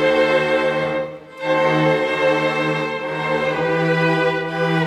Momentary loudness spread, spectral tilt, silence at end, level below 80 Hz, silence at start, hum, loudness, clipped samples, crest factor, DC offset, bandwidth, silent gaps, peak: 7 LU; -6 dB/octave; 0 s; -54 dBFS; 0 s; none; -19 LUFS; under 0.1%; 14 dB; under 0.1%; 11.5 kHz; none; -4 dBFS